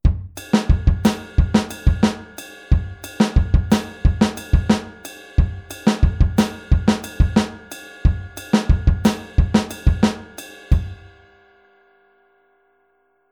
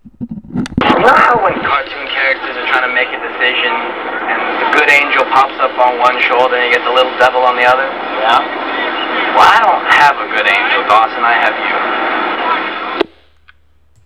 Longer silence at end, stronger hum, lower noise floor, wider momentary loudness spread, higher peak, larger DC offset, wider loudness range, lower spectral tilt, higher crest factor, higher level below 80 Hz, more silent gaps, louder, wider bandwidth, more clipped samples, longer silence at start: first, 2.35 s vs 1 s; neither; first, -63 dBFS vs -52 dBFS; first, 15 LU vs 10 LU; about the same, -2 dBFS vs 0 dBFS; second, under 0.1% vs 0.3%; about the same, 3 LU vs 3 LU; first, -6.5 dB/octave vs -4 dB/octave; first, 18 dB vs 12 dB; first, -22 dBFS vs -46 dBFS; neither; second, -20 LUFS vs -11 LUFS; about the same, 18 kHz vs 18 kHz; second, under 0.1% vs 0.6%; about the same, 0.05 s vs 0.05 s